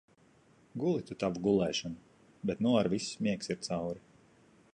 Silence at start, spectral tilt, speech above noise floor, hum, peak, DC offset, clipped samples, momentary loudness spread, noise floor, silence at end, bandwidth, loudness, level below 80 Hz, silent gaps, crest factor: 0.75 s; -5.5 dB/octave; 32 dB; none; -16 dBFS; under 0.1%; under 0.1%; 14 LU; -64 dBFS; 0.75 s; 11 kHz; -33 LUFS; -64 dBFS; none; 18 dB